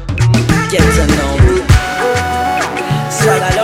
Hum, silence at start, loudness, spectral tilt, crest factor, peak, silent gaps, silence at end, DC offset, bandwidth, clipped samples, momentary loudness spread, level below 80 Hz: none; 0 s; -12 LUFS; -5 dB/octave; 12 dB; 0 dBFS; none; 0 s; under 0.1%; 16.5 kHz; under 0.1%; 5 LU; -20 dBFS